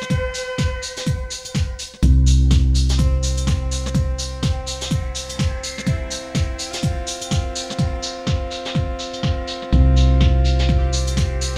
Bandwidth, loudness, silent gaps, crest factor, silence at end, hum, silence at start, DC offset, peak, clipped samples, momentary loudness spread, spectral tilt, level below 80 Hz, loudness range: 12 kHz; -20 LUFS; none; 16 dB; 0 s; none; 0 s; under 0.1%; -4 dBFS; under 0.1%; 9 LU; -5 dB/octave; -20 dBFS; 5 LU